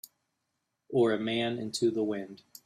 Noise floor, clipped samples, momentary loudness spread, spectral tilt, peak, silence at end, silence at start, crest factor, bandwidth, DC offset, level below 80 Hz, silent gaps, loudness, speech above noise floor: -82 dBFS; under 0.1%; 8 LU; -5 dB/octave; -16 dBFS; 0.3 s; 0.9 s; 16 dB; 15 kHz; under 0.1%; -74 dBFS; none; -30 LUFS; 53 dB